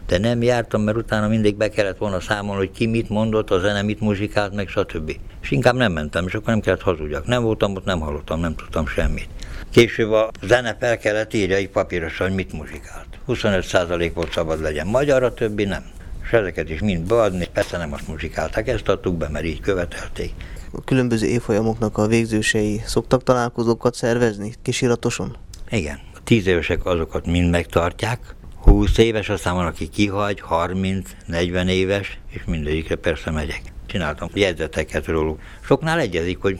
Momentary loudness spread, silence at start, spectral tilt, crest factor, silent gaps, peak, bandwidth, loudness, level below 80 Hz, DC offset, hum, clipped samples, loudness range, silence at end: 11 LU; 0 s; -6 dB/octave; 20 dB; none; 0 dBFS; 15 kHz; -21 LUFS; -30 dBFS; under 0.1%; none; under 0.1%; 3 LU; 0 s